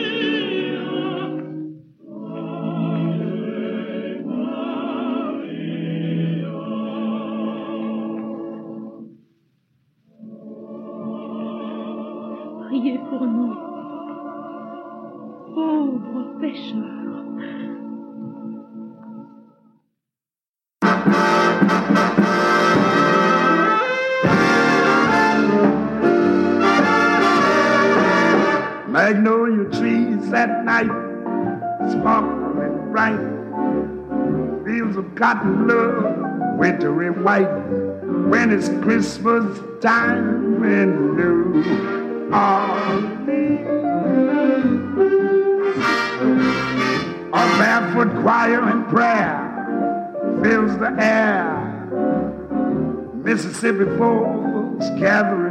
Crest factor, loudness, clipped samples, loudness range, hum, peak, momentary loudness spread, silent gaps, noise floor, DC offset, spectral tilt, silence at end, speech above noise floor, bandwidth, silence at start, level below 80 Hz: 16 dB; -19 LUFS; under 0.1%; 13 LU; none; -2 dBFS; 16 LU; 20.48-20.54 s; under -90 dBFS; under 0.1%; -6 dB/octave; 0 s; over 73 dB; 11.5 kHz; 0 s; -54 dBFS